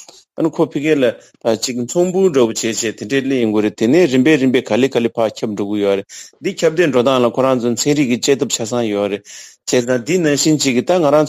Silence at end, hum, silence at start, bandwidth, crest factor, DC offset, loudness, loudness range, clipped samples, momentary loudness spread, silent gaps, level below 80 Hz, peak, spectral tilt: 0 s; none; 0 s; 15.5 kHz; 14 dB; under 0.1%; -16 LUFS; 2 LU; under 0.1%; 8 LU; none; -58 dBFS; 0 dBFS; -4.5 dB/octave